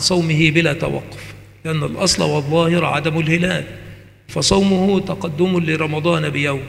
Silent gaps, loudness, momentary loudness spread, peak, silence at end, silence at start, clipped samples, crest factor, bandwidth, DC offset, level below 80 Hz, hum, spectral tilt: none; -17 LUFS; 14 LU; 0 dBFS; 0 s; 0 s; under 0.1%; 18 dB; 13.5 kHz; under 0.1%; -42 dBFS; none; -5 dB/octave